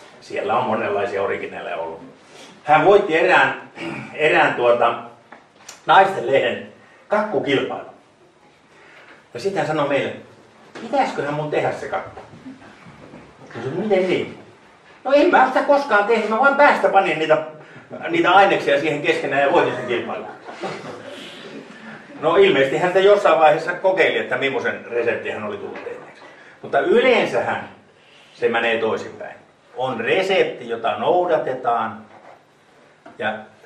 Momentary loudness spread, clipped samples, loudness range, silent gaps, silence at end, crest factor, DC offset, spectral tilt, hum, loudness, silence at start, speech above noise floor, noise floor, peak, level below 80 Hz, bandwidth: 20 LU; under 0.1%; 8 LU; none; 0.2 s; 18 dB; under 0.1%; -5 dB/octave; none; -18 LUFS; 0 s; 34 dB; -52 dBFS; -2 dBFS; -64 dBFS; 11 kHz